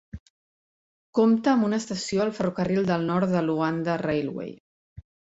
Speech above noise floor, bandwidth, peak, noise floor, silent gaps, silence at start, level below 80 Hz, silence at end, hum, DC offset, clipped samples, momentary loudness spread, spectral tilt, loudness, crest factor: over 66 dB; 8 kHz; -8 dBFS; under -90 dBFS; 0.20-1.13 s, 4.60-4.96 s; 0.15 s; -56 dBFS; 0.4 s; none; under 0.1%; under 0.1%; 12 LU; -6.5 dB/octave; -25 LUFS; 18 dB